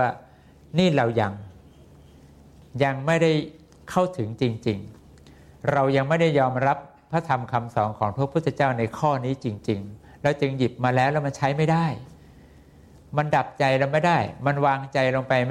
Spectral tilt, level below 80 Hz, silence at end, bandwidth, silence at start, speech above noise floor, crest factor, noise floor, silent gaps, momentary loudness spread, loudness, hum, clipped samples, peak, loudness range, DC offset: -7 dB/octave; -56 dBFS; 0 s; 12 kHz; 0 s; 27 dB; 18 dB; -50 dBFS; none; 9 LU; -24 LUFS; none; under 0.1%; -6 dBFS; 2 LU; under 0.1%